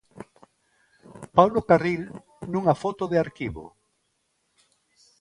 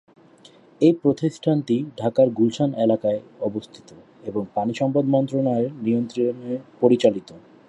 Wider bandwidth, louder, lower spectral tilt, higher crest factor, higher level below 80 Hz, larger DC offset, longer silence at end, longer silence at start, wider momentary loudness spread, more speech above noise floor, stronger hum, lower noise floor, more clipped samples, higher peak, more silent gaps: about the same, 11.5 kHz vs 10.5 kHz; about the same, -24 LUFS vs -22 LUFS; about the same, -7.5 dB/octave vs -8 dB/octave; first, 26 dB vs 20 dB; first, -54 dBFS vs -64 dBFS; neither; first, 1.55 s vs 0.3 s; first, 1.15 s vs 0.8 s; first, 21 LU vs 11 LU; first, 51 dB vs 29 dB; neither; first, -73 dBFS vs -51 dBFS; neither; about the same, -2 dBFS vs -2 dBFS; neither